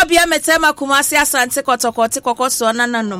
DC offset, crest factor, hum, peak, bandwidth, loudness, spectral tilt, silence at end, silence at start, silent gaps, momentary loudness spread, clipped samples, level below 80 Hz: under 0.1%; 14 dB; none; 0 dBFS; 16.5 kHz; -14 LUFS; -1.5 dB/octave; 0 s; 0 s; none; 5 LU; under 0.1%; -44 dBFS